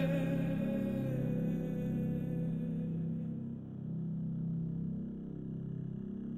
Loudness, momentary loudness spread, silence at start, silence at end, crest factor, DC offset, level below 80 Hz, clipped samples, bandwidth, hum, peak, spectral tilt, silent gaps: -37 LUFS; 8 LU; 0 s; 0 s; 14 dB; under 0.1%; -56 dBFS; under 0.1%; 13 kHz; none; -22 dBFS; -9.5 dB/octave; none